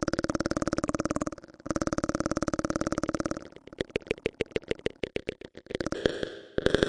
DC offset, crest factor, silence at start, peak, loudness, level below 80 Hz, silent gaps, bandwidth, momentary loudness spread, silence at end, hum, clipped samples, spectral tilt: under 0.1%; 26 dB; 0 s; -4 dBFS; -32 LUFS; -48 dBFS; none; 11.5 kHz; 8 LU; 0 s; none; under 0.1%; -5 dB/octave